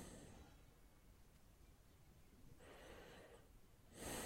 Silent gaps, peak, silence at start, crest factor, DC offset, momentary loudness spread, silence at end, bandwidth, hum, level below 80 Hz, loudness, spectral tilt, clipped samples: none; -36 dBFS; 0 s; 24 dB; under 0.1%; 13 LU; 0 s; 16.5 kHz; none; -68 dBFS; -62 LUFS; -3.5 dB/octave; under 0.1%